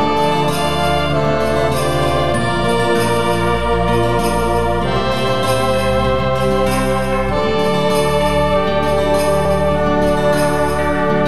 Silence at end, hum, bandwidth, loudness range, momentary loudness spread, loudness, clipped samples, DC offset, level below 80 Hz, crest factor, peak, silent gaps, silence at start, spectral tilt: 0 s; none; 15.5 kHz; 1 LU; 2 LU; -16 LUFS; under 0.1%; 5%; -28 dBFS; 12 dB; -2 dBFS; none; 0 s; -5.5 dB/octave